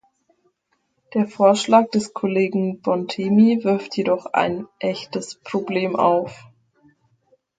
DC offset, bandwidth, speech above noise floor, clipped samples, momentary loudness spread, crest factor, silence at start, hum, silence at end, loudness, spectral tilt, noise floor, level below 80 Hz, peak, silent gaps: under 0.1%; 9.4 kHz; 50 dB; under 0.1%; 11 LU; 20 dB; 1.1 s; none; 1.2 s; -20 LUFS; -6 dB/octave; -70 dBFS; -66 dBFS; 0 dBFS; none